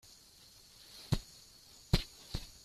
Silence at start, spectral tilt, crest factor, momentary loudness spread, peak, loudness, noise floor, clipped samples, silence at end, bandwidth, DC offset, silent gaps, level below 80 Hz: 0.95 s; -5 dB/octave; 26 dB; 21 LU; -14 dBFS; -38 LUFS; -60 dBFS; under 0.1%; 0.15 s; 15 kHz; under 0.1%; none; -46 dBFS